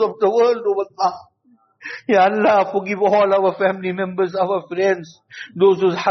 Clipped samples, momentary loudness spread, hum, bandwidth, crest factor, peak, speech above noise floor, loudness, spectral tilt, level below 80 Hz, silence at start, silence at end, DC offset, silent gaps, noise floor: under 0.1%; 17 LU; none; 6.4 kHz; 14 dB; -4 dBFS; 40 dB; -18 LUFS; -4 dB/octave; -68 dBFS; 0 s; 0 s; under 0.1%; none; -58 dBFS